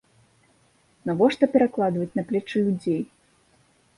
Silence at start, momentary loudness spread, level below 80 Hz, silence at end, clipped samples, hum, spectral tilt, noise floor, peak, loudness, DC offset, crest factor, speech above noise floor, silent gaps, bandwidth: 1.05 s; 9 LU; -64 dBFS; 0.95 s; under 0.1%; none; -7.5 dB/octave; -62 dBFS; -6 dBFS; -24 LUFS; under 0.1%; 20 dB; 40 dB; none; 11.5 kHz